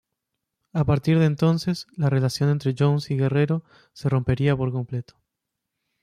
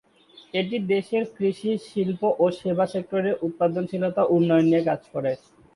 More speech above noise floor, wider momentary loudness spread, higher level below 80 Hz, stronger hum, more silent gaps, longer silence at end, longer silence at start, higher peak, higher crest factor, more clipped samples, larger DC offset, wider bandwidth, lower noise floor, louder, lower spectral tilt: first, 60 dB vs 30 dB; about the same, 9 LU vs 9 LU; first, -50 dBFS vs -66 dBFS; neither; neither; first, 1 s vs 0.4 s; first, 0.75 s vs 0.55 s; about the same, -8 dBFS vs -8 dBFS; about the same, 16 dB vs 16 dB; neither; neither; about the same, 12.5 kHz vs 11.5 kHz; first, -82 dBFS vs -53 dBFS; about the same, -23 LUFS vs -24 LUFS; about the same, -7.5 dB/octave vs -7.5 dB/octave